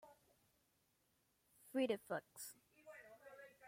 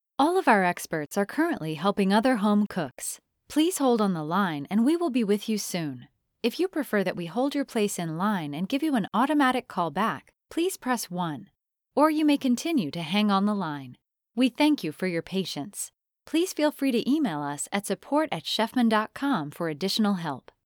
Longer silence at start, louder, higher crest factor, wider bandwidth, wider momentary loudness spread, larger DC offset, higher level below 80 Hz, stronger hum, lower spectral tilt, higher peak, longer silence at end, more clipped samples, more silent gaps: second, 0.05 s vs 0.2 s; second, -45 LUFS vs -26 LUFS; about the same, 22 dB vs 20 dB; second, 16.5 kHz vs over 20 kHz; first, 20 LU vs 9 LU; neither; second, under -90 dBFS vs -70 dBFS; neither; about the same, -4 dB/octave vs -5 dB/octave; second, -28 dBFS vs -8 dBFS; second, 0 s vs 0.25 s; neither; neither